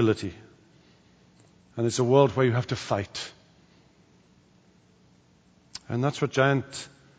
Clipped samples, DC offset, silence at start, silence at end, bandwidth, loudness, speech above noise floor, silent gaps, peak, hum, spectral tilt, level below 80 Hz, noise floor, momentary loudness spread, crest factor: under 0.1%; under 0.1%; 0 s; 0.3 s; 9.8 kHz; -26 LUFS; 35 dB; none; -6 dBFS; none; -6 dB/octave; -64 dBFS; -60 dBFS; 19 LU; 22 dB